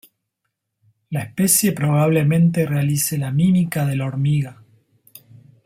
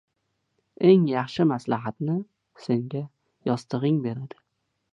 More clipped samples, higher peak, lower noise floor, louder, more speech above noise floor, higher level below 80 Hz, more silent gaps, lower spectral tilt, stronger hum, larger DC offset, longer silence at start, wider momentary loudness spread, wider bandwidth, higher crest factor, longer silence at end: neither; first, -2 dBFS vs -6 dBFS; about the same, -77 dBFS vs -76 dBFS; first, -18 LUFS vs -25 LUFS; first, 59 dB vs 52 dB; first, -56 dBFS vs -68 dBFS; neither; second, -5.5 dB/octave vs -8.5 dB/octave; neither; neither; first, 1.1 s vs 0.8 s; second, 9 LU vs 19 LU; first, 16.5 kHz vs 9.2 kHz; about the same, 18 dB vs 20 dB; first, 1.15 s vs 0.65 s